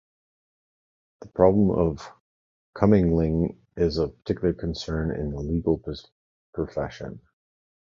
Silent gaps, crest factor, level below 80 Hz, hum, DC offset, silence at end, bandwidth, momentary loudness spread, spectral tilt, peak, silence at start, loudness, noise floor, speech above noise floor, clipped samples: 2.20-2.73 s, 6.12-6.53 s; 22 dB; -40 dBFS; none; under 0.1%; 0.7 s; 7.2 kHz; 18 LU; -8.5 dB/octave; -4 dBFS; 1.2 s; -25 LUFS; under -90 dBFS; over 66 dB; under 0.1%